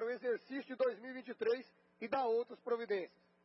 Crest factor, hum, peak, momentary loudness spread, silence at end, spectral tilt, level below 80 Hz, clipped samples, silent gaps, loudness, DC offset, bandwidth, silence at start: 16 dB; none; -24 dBFS; 11 LU; 0.35 s; -2.5 dB/octave; -90 dBFS; under 0.1%; none; -39 LUFS; under 0.1%; 5.6 kHz; 0 s